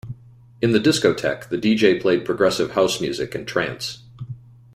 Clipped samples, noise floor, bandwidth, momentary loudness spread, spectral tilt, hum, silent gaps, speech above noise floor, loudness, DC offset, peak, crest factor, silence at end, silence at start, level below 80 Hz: under 0.1%; -39 dBFS; 16 kHz; 20 LU; -5 dB/octave; none; none; 20 dB; -20 LUFS; under 0.1%; -2 dBFS; 18 dB; 0.35 s; 0.05 s; -54 dBFS